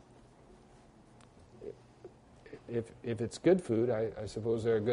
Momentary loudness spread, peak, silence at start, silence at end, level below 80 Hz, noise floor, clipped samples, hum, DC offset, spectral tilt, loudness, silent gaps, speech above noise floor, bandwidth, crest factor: 24 LU; -16 dBFS; 0.5 s; 0 s; -64 dBFS; -59 dBFS; under 0.1%; none; under 0.1%; -7 dB/octave; -33 LUFS; none; 28 dB; 10.5 kHz; 20 dB